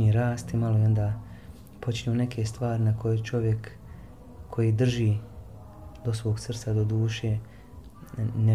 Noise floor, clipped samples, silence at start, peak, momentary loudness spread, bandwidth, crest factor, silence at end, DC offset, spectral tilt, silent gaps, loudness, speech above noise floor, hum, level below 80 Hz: -46 dBFS; under 0.1%; 0 s; -14 dBFS; 22 LU; 10.5 kHz; 14 dB; 0 s; 0.2%; -7.5 dB/octave; none; -28 LUFS; 21 dB; none; -48 dBFS